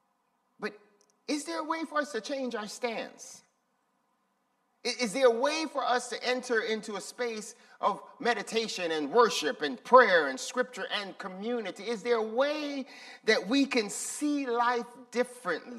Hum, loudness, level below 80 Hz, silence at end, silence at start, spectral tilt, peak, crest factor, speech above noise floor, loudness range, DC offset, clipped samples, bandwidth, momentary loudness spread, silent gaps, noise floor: none; -30 LUFS; -86 dBFS; 0 s; 0.6 s; -2.5 dB/octave; -6 dBFS; 24 dB; 45 dB; 9 LU; under 0.1%; under 0.1%; 13.5 kHz; 14 LU; none; -75 dBFS